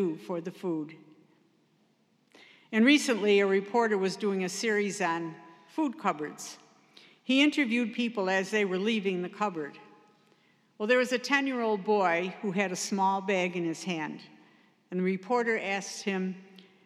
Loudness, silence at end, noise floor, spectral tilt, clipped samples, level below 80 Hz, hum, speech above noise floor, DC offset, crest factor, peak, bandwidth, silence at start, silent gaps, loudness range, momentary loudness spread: -29 LUFS; 0.25 s; -69 dBFS; -4.5 dB/octave; under 0.1%; under -90 dBFS; none; 40 dB; under 0.1%; 20 dB; -10 dBFS; 14 kHz; 0 s; none; 5 LU; 13 LU